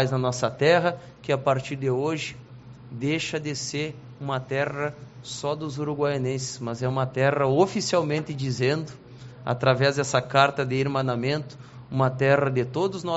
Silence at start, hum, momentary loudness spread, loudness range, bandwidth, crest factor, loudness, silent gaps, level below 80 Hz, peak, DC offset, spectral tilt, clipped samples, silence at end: 0 s; none; 13 LU; 5 LU; 8 kHz; 20 dB; -25 LUFS; none; -60 dBFS; -6 dBFS; under 0.1%; -5 dB/octave; under 0.1%; 0 s